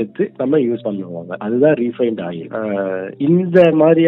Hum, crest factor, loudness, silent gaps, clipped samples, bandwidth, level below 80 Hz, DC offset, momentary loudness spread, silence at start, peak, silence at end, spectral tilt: none; 16 dB; -17 LUFS; none; under 0.1%; 4.6 kHz; -64 dBFS; under 0.1%; 14 LU; 0 s; 0 dBFS; 0 s; -10 dB/octave